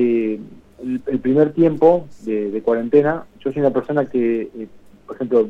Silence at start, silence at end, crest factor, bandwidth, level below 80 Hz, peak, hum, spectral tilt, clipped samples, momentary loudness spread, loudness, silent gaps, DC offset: 0 s; 0 s; 18 dB; 5.6 kHz; -56 dBFS; 0 dBFS; none; -9.5 dB/octave; under 0.1%; 16 LU; -19 LUFS; none; under 0.1%